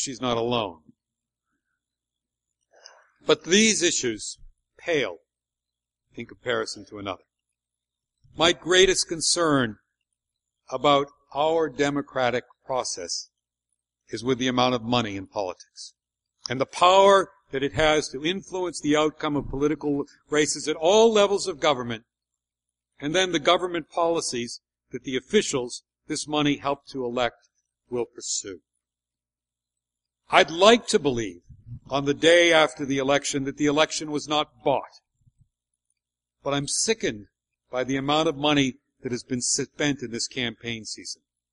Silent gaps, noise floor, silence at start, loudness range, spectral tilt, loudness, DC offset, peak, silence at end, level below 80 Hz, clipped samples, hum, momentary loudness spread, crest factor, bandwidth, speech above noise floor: none; under -90 dBFS; 0 s; 7 LU; -3 dB/octave; -24 LUFS; under 0.1%; 0 dBFS; 0.4 s; -54 dBFS; under 0.1%; 60 Hz at -60 dBFS; 17 LU; 24 dB; 11.5 kHz; over 66 dB